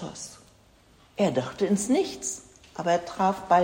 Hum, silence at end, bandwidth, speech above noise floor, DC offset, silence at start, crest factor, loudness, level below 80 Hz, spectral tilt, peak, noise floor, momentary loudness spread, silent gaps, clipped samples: none; 0 s; 16.5 kHz; 32 dB; under 0.1%; 0 s; 20 dB; -27 LUFS; -60 dBFS; -4.5 dB/octave; -8 dBFS; -58 dBFS; 17 LU; none; under 0.1%